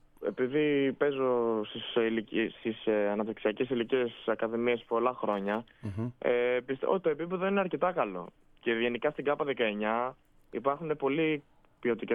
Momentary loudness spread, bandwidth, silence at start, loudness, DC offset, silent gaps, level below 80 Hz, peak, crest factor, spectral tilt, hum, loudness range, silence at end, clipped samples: 7 LU; 3.9 kHz; 0.2 s; -31 LUFS; under 0.1%; none; -66 dBFS; -14 dBFS; 18 dB; -8.5 dB/octave; none; 2 LU; 0 s; under 0.1%